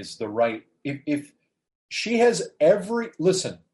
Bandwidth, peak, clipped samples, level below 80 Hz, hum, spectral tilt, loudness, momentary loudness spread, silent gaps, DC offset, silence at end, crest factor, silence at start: 11.5 kHz; -6 dBFS; under 0.1%; -70 dBFS; none; -4.5 dB/octave; -24 LUFS; 12 LU; 1.75-1.89 s; under 0.1%; 0.15 s; 18 dB; 0 s